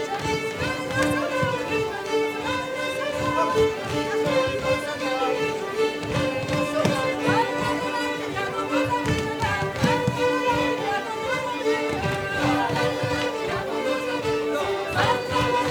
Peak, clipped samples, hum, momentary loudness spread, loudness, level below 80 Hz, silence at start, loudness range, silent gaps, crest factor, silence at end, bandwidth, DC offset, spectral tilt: -8 dBFS; under 0.1%; none; 4 LU; -24 LUFS; -48 dBFS; 0 s; 1 LU; none; 16 dB; 0 s; 19.5 kHz; under 0.1%; -5 dB/octave